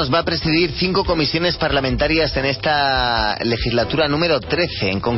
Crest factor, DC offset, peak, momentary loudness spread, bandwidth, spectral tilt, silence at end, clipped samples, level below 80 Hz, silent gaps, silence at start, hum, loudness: 12 dB; under 0.1%; -6 dBFS; 3 LU; 6 kHz; -8 dB/octave; 0 s; under 0.1%; -34 dBFS; none; 0 s; none; -18 LUFS